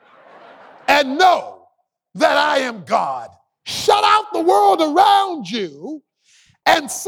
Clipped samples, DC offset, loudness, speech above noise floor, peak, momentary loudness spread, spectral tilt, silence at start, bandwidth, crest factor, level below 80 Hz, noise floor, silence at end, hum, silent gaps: under 0.1%; under 0.1%; -16 LUFS; 45 dB; -2 dBFS; 16 LU; -2.5 dB/octave; 0.9 s; 18 kHz; 16 dB; -62 dBFS; -61 dBFS; 0 s; none; none